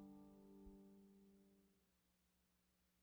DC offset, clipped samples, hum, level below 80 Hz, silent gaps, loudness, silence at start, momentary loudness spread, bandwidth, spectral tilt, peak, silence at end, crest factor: under 0.1%; under 0.1%; 60 Hz at -85 dBFS; -78 dBFS; none; -65 LUFS; 0 s; 4 LU; over 20 kHz; -7 dB/octave; -52 dBFS; 0 s; 16 dB